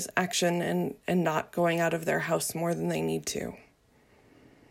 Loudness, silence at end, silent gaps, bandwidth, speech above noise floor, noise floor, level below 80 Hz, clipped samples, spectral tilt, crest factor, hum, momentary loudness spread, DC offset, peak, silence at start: -29 LUFS; 1.1 s; none; 16.5 kHz; 34 dB; -63 dBFS; -66 dBFS; under 0.1%; -4.5 dB/octave; 20 dB; none; 5 LU; under 0.1%; -10 dBFS; 0 s